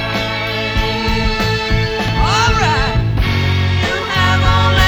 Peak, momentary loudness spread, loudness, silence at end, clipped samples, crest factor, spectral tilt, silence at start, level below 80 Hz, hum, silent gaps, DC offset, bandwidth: 0 dBFS; 5 LU; -15 LUFS; 0 s; under 0.1%; 14 dB; -5 dB/octave; 0 s; -22 dBFS; none; none; under 0.1%; 17.5 kHz